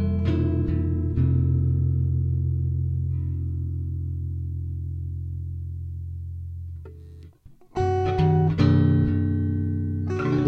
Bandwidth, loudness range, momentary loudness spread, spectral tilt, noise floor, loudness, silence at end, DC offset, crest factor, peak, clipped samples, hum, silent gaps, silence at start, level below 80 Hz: 6.4 kHz; 10 LU; 14 LU; -10 dB/octave; -49 dBFS; -25 LUFS; 0 s; under 0.1%; 16 dB; -8 dBFS; under 0.1%; none; none; 0 s; -36 dBFS